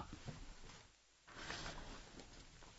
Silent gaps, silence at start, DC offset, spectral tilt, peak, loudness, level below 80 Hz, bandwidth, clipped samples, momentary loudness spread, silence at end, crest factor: none; 0 s; under 0.1%; -2.5 dB/octave; -32 dBFS; -54 LUFS; -60 dBFS; 7.6 kHz; under 0.1%; 13 LU; 0 s; 22 dB